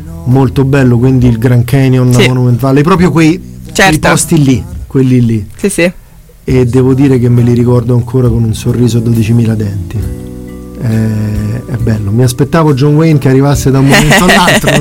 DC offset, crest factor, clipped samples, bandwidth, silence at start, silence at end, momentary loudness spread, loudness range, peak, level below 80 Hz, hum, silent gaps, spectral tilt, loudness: under 0.1%; 8 dB; 0.6%; 16.5 kHz; 0 s; 0 s; 10 LU; 5 LU; 0 dBFS; -26 dBFS; none; none; -6 dB/octave; -8 LUFS